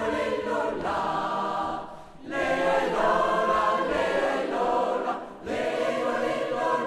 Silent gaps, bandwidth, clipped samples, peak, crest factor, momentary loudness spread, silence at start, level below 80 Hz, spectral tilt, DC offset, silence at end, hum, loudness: none; 13 kHz; under 0.1%; -12 dBFS; 16 dB; 9 LU; 0 s; -54 dBFS; -4.5 dB/octave; under 0.1%; 0 s; none; -26 LUFS